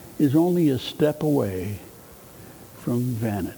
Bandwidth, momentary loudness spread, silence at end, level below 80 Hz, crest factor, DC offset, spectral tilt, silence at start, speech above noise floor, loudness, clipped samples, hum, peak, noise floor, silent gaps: over 20 kHz; 24 LU; 0 s; -56 dBFS; 16 dB; under 0.1%; -7.5 dB/octave; 0 s; 23 dB; -23 LUFS; under 0.1%; none; -8 dBFS; -46 dBFS; none